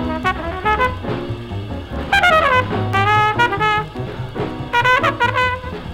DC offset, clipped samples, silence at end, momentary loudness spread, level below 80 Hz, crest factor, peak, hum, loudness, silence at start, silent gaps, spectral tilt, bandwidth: under 0.1%; under 0.1%; 0 s; 13 LU; -34 dBFS; 16 dB; -2 dBFS; none; -17 LUFS; 0 s; none; -5.5 dB/octave; 16.5 kHz